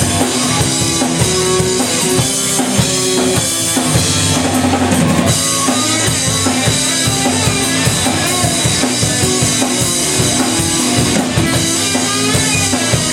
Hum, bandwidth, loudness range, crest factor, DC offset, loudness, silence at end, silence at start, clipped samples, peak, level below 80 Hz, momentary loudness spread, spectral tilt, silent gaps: none; 17 kHz; 0 LU; 14 dB; under 0.1%; -12 LUFS; 0 s; 0 s; under 0.1%; 0 dBFS; -36 dBFS; 1 LU; -3 dB/octave; none